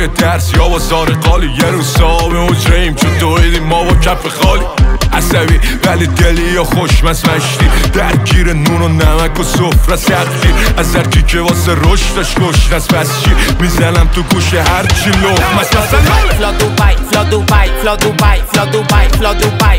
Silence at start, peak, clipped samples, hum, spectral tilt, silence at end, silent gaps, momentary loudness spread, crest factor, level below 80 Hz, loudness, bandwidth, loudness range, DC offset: 0 s; 0 dBFS; under 0.1%; none; -5 dB/octave; 0 s; none; 2 LU; 8 dB; -12 dBFS; -10 LUFS; 16.5 kHz; 1 LU; under 0.1%